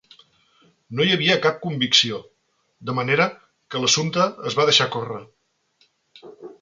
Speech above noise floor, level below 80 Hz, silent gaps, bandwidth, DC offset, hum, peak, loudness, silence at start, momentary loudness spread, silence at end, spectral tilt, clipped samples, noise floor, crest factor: 47 dB; -64 dBFS; none; 9.4 kHz; under 0.1%; none; -2 dBFS; -20 LUFS; 0.9 s; 16 LU; 0.1 s; -3 dB/octave; under 0.1%; -68 dBFS; 22 dB